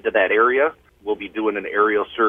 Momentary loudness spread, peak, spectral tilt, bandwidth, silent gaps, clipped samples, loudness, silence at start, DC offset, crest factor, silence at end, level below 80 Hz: 11 LU; -4 dBFS; -6.5 dB/octave; 3.7 kHz; none; under 0.1%; -20 LUFS; 0.05 s; under 0.1%; 16 dB; 0 s; -58 dBFS